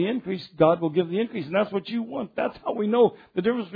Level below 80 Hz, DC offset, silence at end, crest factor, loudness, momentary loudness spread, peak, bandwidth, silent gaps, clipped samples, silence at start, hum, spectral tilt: -64 dBFS; under 0.1%; 0 s; 18 dB; -25 LUFS; 9 LU; -6 dBFS; 5 kHz; none; under 0.1%; 0 s; none; -9.5 dB/octave